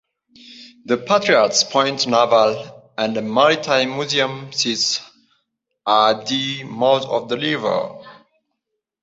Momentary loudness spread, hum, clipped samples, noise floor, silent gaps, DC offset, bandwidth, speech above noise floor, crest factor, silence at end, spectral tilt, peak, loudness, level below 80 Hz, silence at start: 10 LU; none; under 0.1%; -78 dBFS; none; under 0.1%; 8 kHz; 60 dB; 18 dB; 0.9 s; -3 dB/octave; -2 dBFS; -18 LUFS; -64 dBFS; 0.45 s